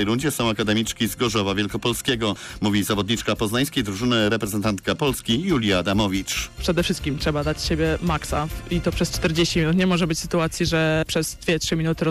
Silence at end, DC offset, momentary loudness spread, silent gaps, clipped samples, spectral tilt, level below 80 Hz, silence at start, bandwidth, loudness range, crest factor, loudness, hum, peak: 0 s; under 0.1%; 4 LU; none; under 0.1%; -4.5 dB/octave; -38 dBFS; 0 s; 15.5 kHz; 1 LU; 10 dB; -22 LUFS; none; -12 dBFS